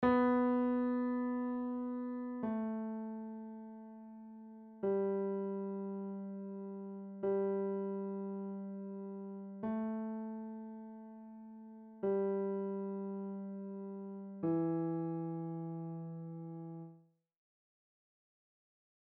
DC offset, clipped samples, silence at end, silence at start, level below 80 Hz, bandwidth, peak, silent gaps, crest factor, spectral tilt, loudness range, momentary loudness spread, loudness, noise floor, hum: under 0.1%; under 0.1%; 2 s; 0 s; -74 dBFS; 4.4 kHz; -20 dBFS; none; 18 dB; -8.5 dB/octave; 5 LU; 17 LU; -39 LUFS; -63 dBFS; none